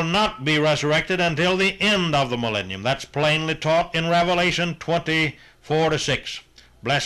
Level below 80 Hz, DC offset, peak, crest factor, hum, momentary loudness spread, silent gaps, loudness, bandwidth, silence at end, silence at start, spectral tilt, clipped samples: -48 dBFS; under 0.1%; -10 dBFS; 12 dB; none; 6 LU; none; -21 LUFS; 13 kHz; 0 s; 0 s; -4.5 dB/octave; under 0.1%